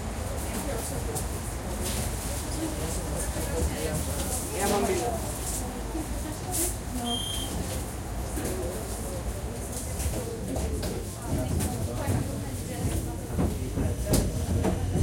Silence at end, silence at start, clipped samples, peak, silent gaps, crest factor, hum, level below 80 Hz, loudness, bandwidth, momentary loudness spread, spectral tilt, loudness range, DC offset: 0 s; 0 s; under 0.1%; -10 dBFS; none; 20 dB; none; -36 dBFS; -31 LUFS; 16.5 kHz; 7 LU; -4.5 dB/octave; 3 LU; under 0.1%